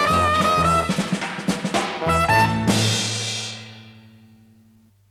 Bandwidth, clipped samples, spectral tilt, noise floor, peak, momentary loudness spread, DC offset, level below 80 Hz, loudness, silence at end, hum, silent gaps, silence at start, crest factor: 16 kHz; under 0.1%; -4 dB/octave; -55 dBFS; -4 dBFS; 9 LU; under 0.1%; -46 dBFS; -20 LUFS; 1.1 s; none; none; 0 s; 16 dB